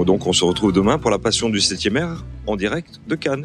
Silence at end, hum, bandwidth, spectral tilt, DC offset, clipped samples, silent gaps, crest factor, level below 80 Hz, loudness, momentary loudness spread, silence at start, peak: 0 s; none; 12 kHz; -4 dB/octave; under 0.1%; under 0.1%; none; 16 dB; -40 dBFS; -19 LUFS; 11 LU; 0 s; -2 dBFS